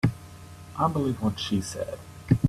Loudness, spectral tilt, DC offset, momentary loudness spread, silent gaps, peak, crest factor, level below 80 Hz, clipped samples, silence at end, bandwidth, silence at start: -28 LUFS; -6.5 dB/octave; under 0.1%; 19 LU; none; -6 dBFS; 22 dB; -50 dBFS; under 0.1%; 0 s; 14.5 kHz; 0.05 s